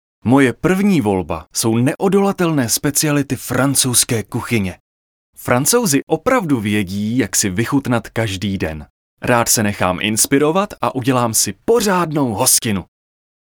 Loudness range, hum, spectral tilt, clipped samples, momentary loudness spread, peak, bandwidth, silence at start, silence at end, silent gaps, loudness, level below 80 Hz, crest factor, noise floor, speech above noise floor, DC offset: 2 LU; none; -4 dB/octave; under 0.1%; 8 LU; 0 dBFS; over 20 kHz; 0.25 s; 0.6 s; 4.80-5.33 s, 6.03-6.07 s, 8.90-9.17 s; -16 LUFS; -48 dBFS; 16 dB; under -90 dBFS; over 74 dB; under 0.1%